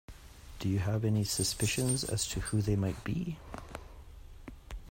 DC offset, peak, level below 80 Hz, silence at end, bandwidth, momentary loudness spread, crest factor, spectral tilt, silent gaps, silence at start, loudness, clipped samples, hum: under 0.1%; -16 dBFS; -48 dBFS; 0 s; 16.5 kHz; 22 LU; 18 dB; -4.5 dB/octave; none; 0.1 s; -32 LUFS; under 0.1%; none